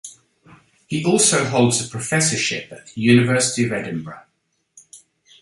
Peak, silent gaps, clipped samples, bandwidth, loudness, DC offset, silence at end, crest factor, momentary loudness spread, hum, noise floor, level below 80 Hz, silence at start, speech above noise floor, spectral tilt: -2 dBFS; none; under 0.1%; 12 kHz; -18 LUFS; under 0.1%; 0.45 s; 18 dB; 15 LU; none; -70 dBFS; -58 dBFS; 0.05 s; 51 dB; -4 dB/octave